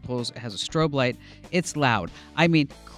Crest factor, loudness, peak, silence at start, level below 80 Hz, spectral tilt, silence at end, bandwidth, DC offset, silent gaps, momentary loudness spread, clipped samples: 20 dB; -25 LUFS; -6 dBFS; 0.05 s; -52 dBFS; -5 dB/octave; 0 s; 13 kHz; under 0.1%; none; 10 LU; under 0.1%